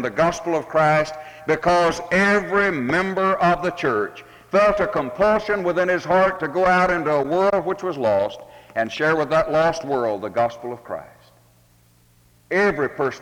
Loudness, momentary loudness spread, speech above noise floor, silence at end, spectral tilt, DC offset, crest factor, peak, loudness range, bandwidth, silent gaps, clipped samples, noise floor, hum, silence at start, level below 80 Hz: -20 LUFS; 8 LU; 36 dB; 0 s; -5.5 dB/octave; under 0.1%; 16 dB; -6 dBFS; 5 LU; 17 kHz; none; under 0.1%; -56 dBFS; none; 0 s; -50 dBFS